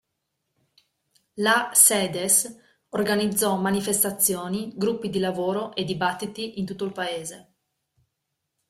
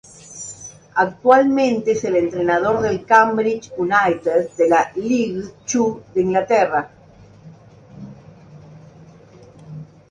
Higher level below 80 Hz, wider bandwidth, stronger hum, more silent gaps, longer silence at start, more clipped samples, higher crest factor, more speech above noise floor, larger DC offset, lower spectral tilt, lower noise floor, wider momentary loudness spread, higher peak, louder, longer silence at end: second, -64 dBFS vs -56 dBFS; first, 16 kHz vs 10 kHz; neither; neither; first, 1.35 s vs 0.3 s; neither; about the same, 22 dB vs 20 dB; first, 56 dB vs 29 dB; neither; second, -2.5 dB/octave vs -5 dB/octave; first, -80 dBFS vs -46 dBFS; second, 15 LU vs 24 LU; about the same, -2 dBFS vs 0 dBFS; second, -23 LUFS vs -18 LUFS; first, 1.25 s vs 0.25 s